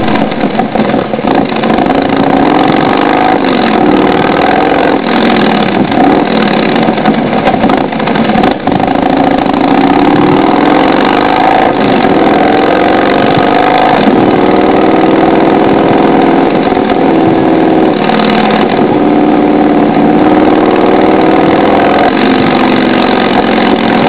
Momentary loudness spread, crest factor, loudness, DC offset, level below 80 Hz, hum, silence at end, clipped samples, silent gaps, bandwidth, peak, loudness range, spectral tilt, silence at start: 3 LU; 6 dB; -7 LUFS; 1%; -34 dBFS; none; 0 s; 1%; none; 4 kHz; 0 dBFS; 2 LU; -10 dB/octave; 0 s